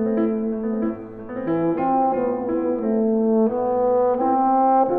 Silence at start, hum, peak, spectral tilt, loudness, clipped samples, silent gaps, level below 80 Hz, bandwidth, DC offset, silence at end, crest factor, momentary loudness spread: 0 s; none; -8 dBFS; -12 dB/octave; -21 LUFS; under 0.1%; none; -54 dBFS; 3.4 kHz; under 0.1%; 0 s; 12 dB; 7 LU